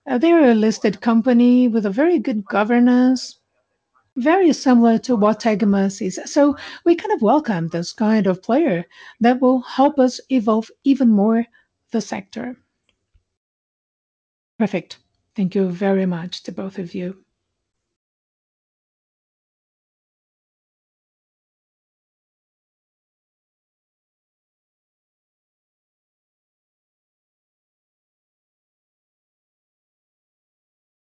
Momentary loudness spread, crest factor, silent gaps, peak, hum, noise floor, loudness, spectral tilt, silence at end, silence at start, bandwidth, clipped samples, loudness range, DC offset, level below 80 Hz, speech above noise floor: 14 LU; 16 dB; 13.37-14.59 s; -4 dBFS; none; -71 dBFS; -18 LUFS; -6.5 dB/octave; 14 s; 0.05 s; 8.2 kHz; under 0.1%; 13 LU; under 0.1%; -66 dBFS; 54 dB